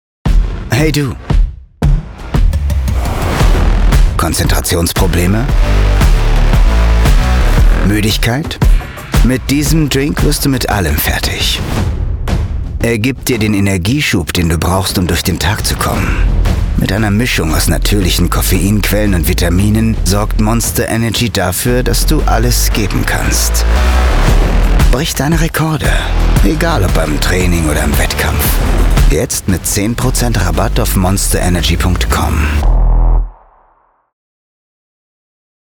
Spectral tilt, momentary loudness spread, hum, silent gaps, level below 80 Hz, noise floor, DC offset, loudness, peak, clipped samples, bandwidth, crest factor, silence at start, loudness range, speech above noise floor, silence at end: -4.5 dB/octave; 4 LU; none; none; -14 dBFS; -52 dBFS; under 0.1%; -13 LUFS; 0 dBFS; under 0.1%; over 20 kHz; 10 dB; 0.25 s; 2 LU; 41 dB; 2.35 s